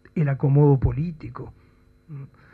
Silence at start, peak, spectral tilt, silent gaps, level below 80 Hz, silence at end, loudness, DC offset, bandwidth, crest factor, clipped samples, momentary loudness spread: 0.15 s; -8 dBFS; -12.5 dB/octave; none; -40 dBFS; 0.25 s; -21 LUFS; under 0.1%; 2.9 kHz; 14 dB; under 0.1%; 24 LU